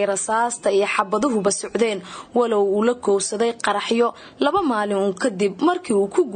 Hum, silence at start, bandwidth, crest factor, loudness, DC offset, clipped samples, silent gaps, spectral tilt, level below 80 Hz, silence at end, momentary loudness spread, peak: none; 0 s; 9.6 kHz; 16 dB; -21 LUFS; under 0.1%; under 0.1%; none; -4 dB/octave; -60 dBFS; 0 s; 3 LU; -6 dBFS